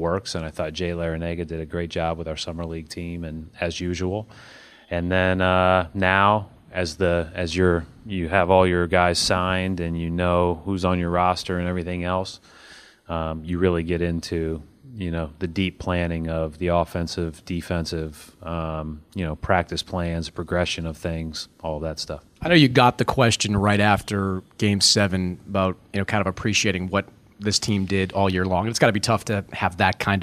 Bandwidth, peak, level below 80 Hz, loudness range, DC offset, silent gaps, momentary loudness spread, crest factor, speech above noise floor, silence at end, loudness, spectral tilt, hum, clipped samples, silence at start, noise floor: 15 kHz; -2 dBFS; -42 dBFS; 7 LU; under 0.1%; none; 13 LU; 22 dB; 25 dB; 0 s; -23 LUFS; -5 dB/octave; none; under 0.1%; 0 s; -48 dBFS